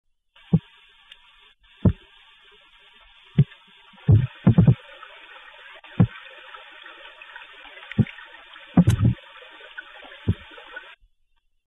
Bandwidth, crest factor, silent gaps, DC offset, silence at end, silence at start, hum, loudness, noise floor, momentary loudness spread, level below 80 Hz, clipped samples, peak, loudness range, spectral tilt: 12 kHz; 22 dB; none; under 0.1%; 0.9 s; 0.5 s; none; -22 LUFS; -66 dBFS; 24 LU; -42 dBFS; under 0.1%; -4 dBFS; 7 LU; -8.5 dB/octave